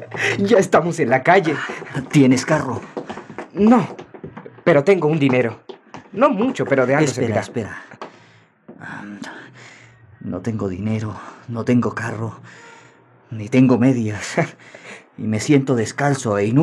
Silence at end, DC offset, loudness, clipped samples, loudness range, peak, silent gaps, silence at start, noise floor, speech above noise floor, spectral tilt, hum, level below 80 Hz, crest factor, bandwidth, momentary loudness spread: 0 s; under 0.1%; -18 LUFS; under 0.1%; 11 LU; -2 dBFS; none; 0 s; -51 dBFS; 33 dB; -6.5 dB/octave; none; -62 dBFS; 18 dB; 12 kHz; 22 LU